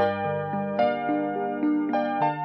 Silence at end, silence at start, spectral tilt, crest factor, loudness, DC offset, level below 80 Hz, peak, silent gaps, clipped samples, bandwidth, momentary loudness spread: 0 s; 0 s; -9 dB/octave; 14 dB; -26 LUFS; under 0.1%; -70 dBFS; -12 dBFS; none; under 0.1%; 5.8 kHz; 4 LU